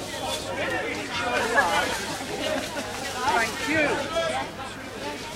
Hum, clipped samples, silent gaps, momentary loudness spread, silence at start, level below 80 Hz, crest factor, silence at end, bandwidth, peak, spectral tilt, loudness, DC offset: none; under 0.1%; none; 11 LU; 0 s; -50 dBFS; 20 dB; 0 s; 16 kHz; -8 dBFS; -3 dB/octave; -26 LUFS; under 0.1%